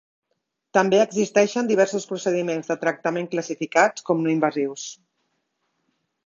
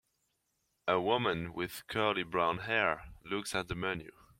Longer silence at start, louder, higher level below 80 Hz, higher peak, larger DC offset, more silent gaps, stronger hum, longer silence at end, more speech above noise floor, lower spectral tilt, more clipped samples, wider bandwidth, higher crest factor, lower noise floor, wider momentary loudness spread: about the same, 0.75 s vs 0.85 s; first, -22 LUFS vs -34 LUFS; second, -70 dBFS vs -60 dBFS; first, -2 dBFS vs -14 dBFS; neither; neither; neither; first, 1.3 s vs 0.3 s; first, 55 dB vs 46 dB; about the same, -4.5 dB/octave vs -4.5 dB/octave; neither; second, 7.6 kHz vs 16.5 kHz; about the same, 20 dB vs 22 dB; about the same, -77 dBFS vs -80 dBFS; about the same, 8 LU vs 9 LU